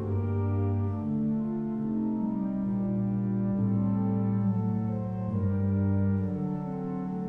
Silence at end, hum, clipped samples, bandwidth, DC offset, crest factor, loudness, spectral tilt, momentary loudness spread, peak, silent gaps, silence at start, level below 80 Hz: 0 s; none; under 0.1%; 2.8 kHz; under 0.1%; 10 dB; -29 LUFS; -12.5 dB/octave; 5 LU; -18 dBFS; none; 0 s; -54 dBFS